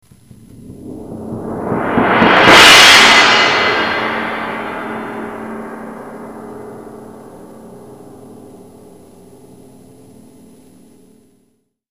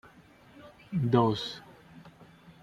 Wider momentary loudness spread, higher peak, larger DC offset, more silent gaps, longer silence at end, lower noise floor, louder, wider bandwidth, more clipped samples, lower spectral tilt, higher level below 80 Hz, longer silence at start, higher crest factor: about the same, 29 LU vs 27 LU; first, 0 dBFS vs -10 dBFS; first, 0.2% vs under 0.1%; neither; first, 3.55 s vs 0.55 s; first, -61 dBFS vs -56 dBFS; first, -7 LUFS vs -29 LUFS; first, over 20 kHz vs 10.5 kHz; first, 0.5% vs under 0.1%; second, -2 dB/octave vs -7.5 dB/octave; first, -46 dBFS vs -64 dBFS; about the same, 0.7 s vs 0.65 s; second, 14 dB vs 22 dB